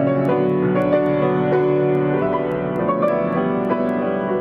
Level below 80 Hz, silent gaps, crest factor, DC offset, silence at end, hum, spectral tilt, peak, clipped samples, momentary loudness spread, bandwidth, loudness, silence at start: -50 dBFS; none; 14 dB; under 0.1%; 0 s; none; -10 dB/octave; -6 dBFS; under 0.1%; 4 LU; 4.9 kHz; -19 LUFS; 0 s